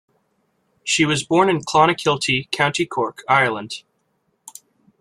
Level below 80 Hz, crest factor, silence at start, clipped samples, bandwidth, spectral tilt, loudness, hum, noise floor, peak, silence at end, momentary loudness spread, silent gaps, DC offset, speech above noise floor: -58 dBFS; 20 dB; 0.85 s; under 0.1%; 15 kHz; -4 dB/octave; -18 LUFS; none; -68 dBFS; -2 dBFS; 1.2 s; 12 LU; none; under 0.1%; 50 dB